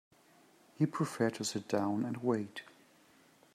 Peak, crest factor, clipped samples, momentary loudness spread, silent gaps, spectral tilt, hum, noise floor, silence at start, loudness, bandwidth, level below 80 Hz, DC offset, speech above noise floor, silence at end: -16 dBFS; 20 dB; under 0.1%; 5 LU; none; -5.5 dB/octave; none; -65 dBFS; 0.8 s; -35 LUFS; 14.5 kHz; -82 dBFS; under 0.1%; 30 dB; 0.85 s